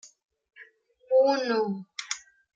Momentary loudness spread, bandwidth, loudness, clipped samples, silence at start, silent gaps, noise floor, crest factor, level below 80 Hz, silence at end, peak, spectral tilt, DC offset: 14 LU; 9 kHz; -27 LUFS; under 0.1%; 0.05 s; 0.25-0.29 s; -56 dBFS; 18 dB; -82 dBFS; 0.35 s; -10 dBFS; -4 dB/octave; under 0.1%